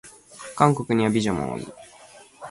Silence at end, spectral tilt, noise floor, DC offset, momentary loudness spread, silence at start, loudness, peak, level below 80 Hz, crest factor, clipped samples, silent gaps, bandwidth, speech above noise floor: 0 s; -6 dB/octave; -49 dBFS; under 0.1%; 21 LU; 0.05 s; -23 LUFS; -2 dBFS; -54 dBFS; 22 dB; under 0.1%; none; 11.5 kHz; 27 dB